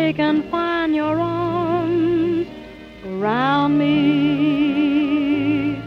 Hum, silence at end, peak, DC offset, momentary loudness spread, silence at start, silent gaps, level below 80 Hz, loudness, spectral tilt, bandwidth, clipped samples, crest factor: none; 0 s; -6 dBFS; under 0.1%; 8 LU; 0 s; none; -50 dBFS; -19 LUFS; -8 dB/octave; 5.8 kHz; under 0.1%; 12 dB